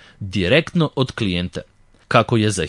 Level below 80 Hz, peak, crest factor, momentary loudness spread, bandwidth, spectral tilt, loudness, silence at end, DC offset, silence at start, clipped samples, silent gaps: -48 dBFS; 0 dBFS; 20 dB; 11 LU; 11.5 kHz; -5.5 dB/octave; -19 LUFS; 0 s; under 0.1%; 0.2 s; under 0.1%; none